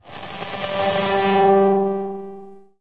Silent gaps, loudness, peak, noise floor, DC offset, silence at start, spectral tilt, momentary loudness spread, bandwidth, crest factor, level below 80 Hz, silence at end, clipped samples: none; -19 LUFS; -4 dBFS; -40 dBFS; 0.6%; 0.05 s; -8.5 dB/octave; 18 LU; 4.8 kHz; 16 dB; -60 dBFS; 0.25 s; under 0.1%